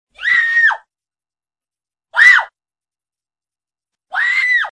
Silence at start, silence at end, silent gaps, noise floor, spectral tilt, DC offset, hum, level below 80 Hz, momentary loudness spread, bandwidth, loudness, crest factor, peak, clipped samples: 0.2 s; 0 s; none; under -90 dBFS; 2.5 dB/octave; under 0.1%; none; -64 dBFS; 16 LU; 10.5 kHz; -11 LUFS; 18 dB; 0 dBFS; under 0.1%